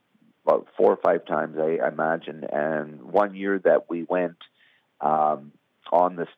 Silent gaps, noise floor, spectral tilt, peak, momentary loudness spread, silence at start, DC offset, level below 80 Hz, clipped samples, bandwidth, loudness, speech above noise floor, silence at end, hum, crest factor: none; -50 dBFS; -8.5 dB/octave; -6 dBFS; 8 LU; 0.45 s; under 0.1%; -82 dBFS; under 0.1%; 5 kHz; -24 LUFS; 26 dB; 0.1 s; none; 20 dB